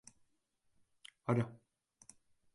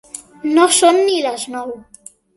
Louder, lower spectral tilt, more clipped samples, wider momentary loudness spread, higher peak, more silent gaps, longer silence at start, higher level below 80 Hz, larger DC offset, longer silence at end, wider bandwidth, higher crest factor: second, -38 LUFS vs -14 LUFS; first, -7.5 dB/octave vs -1 dB/octave; neither; first, 25 LU vs 20 LU; second, -20 dBFS vs 0 dBFS; neither; first, 1.3 s vs 0.15 s; second, -76 dBFS vs -62 dBFS; neither; first, 1 s vs 0.55 s; about the same, 11.5 kHz vs 12 kHz; first, 22 dB vs 16 dB